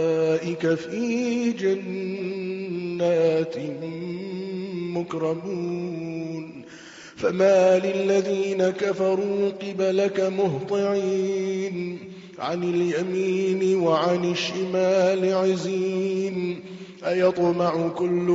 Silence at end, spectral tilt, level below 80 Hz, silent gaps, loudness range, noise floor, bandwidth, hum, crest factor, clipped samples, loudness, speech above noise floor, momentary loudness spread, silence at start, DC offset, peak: 0 s; -5.5 dB/octave; -66 dBFS; none; 5 LU; -44 dBFS; 7.8 kHz; none; 16 dB; under 0.1%; -24 LUFS; 21 dB; 11 LU; 0 s; under 0.1%; -8 dBFS